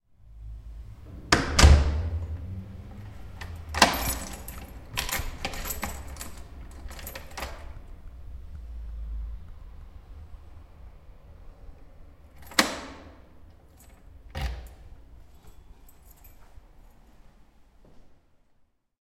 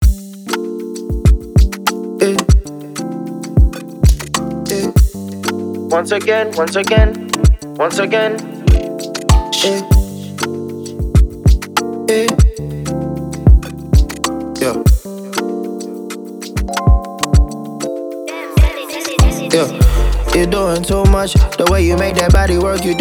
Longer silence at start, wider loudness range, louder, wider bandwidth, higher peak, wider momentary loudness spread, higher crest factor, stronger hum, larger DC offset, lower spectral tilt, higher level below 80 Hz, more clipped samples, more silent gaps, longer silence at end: first, 0.25 s vs 0 s; first, 19 LU vs 4 LU; second, -27 LUFS vs -15 LUFS; about the same, 16.5 kHz vs 18 kHz; about the same, 0 dBFS vs 0 dBFS; first, 27 LU vs 11 LU; first, 30 dB vs 14 dB; neither; neither; second, -3.5 dB/octave vs -5.5 dB/octave; second, -34 dBFS vs -16 dBFS; neither; neither; first, 0.9 s vs 0 s